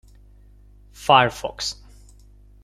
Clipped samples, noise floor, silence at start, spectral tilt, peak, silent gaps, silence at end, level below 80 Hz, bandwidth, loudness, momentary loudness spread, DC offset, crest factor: under 0.1%; -49 dBFS; 1 s; -3.5 dB/octave; -2 dBFS; none; 0.9 s; -48 dBFS; 15 kHz; -20 LUFS; 14 LU; under 0.1%; 24 dB